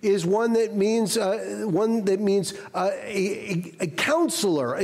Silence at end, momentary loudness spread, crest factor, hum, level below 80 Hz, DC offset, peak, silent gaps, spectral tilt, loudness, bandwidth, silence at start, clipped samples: 0 s; 6 LU; 12 dB; none; -66 dBFS; under 0.1%; -12 dBFS; none; -4.5 dB/octave; -24 LUFS; 16 kHz; 0.05 s; under 0.1%